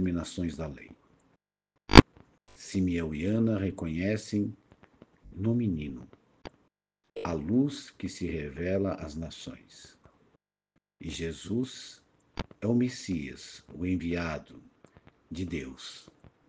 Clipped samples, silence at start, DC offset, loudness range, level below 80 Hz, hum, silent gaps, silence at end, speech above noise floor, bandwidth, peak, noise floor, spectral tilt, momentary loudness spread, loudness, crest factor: under 0.1%; 0 s; under 0.1%; 11 LU; -42 dBFS; none; none; 0.5 s; 49 dB; 9.8 kHz; 0 dBFS; -81 dBFS; -6 dB/octave; 18 LU; -30 LUFS; 30 dB